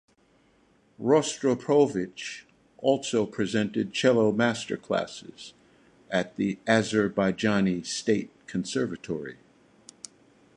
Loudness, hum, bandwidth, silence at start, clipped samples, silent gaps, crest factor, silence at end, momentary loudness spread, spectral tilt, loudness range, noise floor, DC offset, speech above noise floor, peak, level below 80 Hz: -27 LUFS; none; 11 kHz; 1 s; under 0.1%; none; 20 dB; 1.25 s; 19 LU; -5 dB/octave; 2 LU; -63 dBFS; under 0.1%; 37 dB; -8 dBFS; -64 dBFS